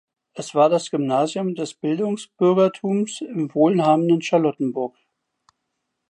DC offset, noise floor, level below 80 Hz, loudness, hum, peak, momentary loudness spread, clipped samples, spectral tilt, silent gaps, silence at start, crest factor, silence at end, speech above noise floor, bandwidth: under 0.1%; -77 dBFS; -76 dBFS; -21 LUFS; none; -4 dBFS; 9 LU; under 0.1%; -6.5 dB/octave; none; 0.35 s; 16 dB; 1.2 s; 57 dB; 11 kHz